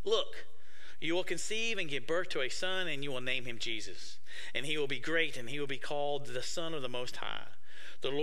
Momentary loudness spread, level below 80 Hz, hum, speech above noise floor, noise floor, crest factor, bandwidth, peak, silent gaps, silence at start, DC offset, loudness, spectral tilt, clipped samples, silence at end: 13 LU; -66 dBFS; none; 21 dB; -58 dBFS; 22 dB; 15.5 kHz; -14 dBFS; none; 0.05 s; 3%; -36 LUFS; -3 dB/octave; under 0.1%; 0 s